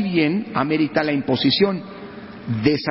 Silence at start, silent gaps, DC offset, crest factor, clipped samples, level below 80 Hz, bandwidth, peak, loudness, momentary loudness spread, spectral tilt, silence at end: 0 s; none; under 0.1%; 16 dB; under 0.1%; -54 dBFS; 5.8 kHz; -4 dBFS; -20 LUFS; 18 LU; -10 dB/octave; 0 s